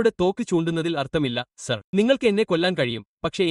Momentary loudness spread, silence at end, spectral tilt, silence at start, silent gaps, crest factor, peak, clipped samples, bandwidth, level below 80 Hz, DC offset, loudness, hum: 9 LU; 0 s; -5.5 dB/octave; 0 s; 1.84-1.93 s, 3.07-3.17 s; 18 dB; -6 dBFS; under 0.1%; 11.5 kHz; -54 dBFS; under 0.1%; -23 LUFS; none